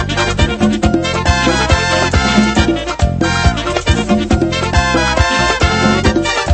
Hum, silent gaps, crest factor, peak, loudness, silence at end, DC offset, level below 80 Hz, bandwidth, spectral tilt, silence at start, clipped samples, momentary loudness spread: none; none; 12 dB; 0 dBFS; -13 LUFS; 0 s; under 0.1%; -20 dBFS; 8.8 kHz; -5 dB/octave; 0 s; under 0.1%; 3 LU